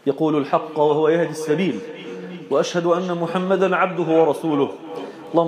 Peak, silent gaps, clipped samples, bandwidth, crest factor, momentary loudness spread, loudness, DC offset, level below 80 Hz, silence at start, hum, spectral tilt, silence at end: -4 dBFS; none; under 0.1%; 14.5 kHz; 16 dB; 15 LU; -20 LUFS; under 0.1%; -76 dBFS; 0.05 s; none; -6.5 dB/octave; 0 s